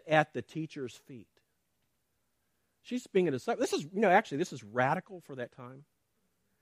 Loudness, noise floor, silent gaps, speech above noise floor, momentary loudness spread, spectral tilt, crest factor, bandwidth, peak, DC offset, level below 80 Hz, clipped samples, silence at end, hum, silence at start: -32 LUFS; -80 dBFS; none; 48 dB; 23 LU; -5.5 dB/octave; 24 dB; 15 kHz; -10 dBFS; under 0.1%; -78 dBFS; under 0.1%; 0.8 s; none; 0.05 s